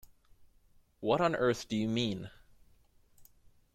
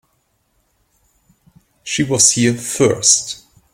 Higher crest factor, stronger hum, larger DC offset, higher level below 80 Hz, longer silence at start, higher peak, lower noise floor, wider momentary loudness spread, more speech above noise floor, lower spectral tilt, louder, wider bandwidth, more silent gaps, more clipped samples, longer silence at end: about the same, 20 dB vs 20 dB; neither; neither; second, -64 dBFS vs -54 dBFS; second, 0.4 s vs 1.85 s; second, -16 dBFS vs 0 dBFS; about the same, -65 dBFS vs -64 dBFS; second, 12 LU vs 18 LU; second, 34 dB vs 49 dB; first, -5.5 dB/octave vs -2.5 dB/octave; second, -32 LUFS vs -14 LUFS; about the same, 15.5 kHz vs 16.5 kHz; neither; neither; about the same, 0.5 s vs 0.4 s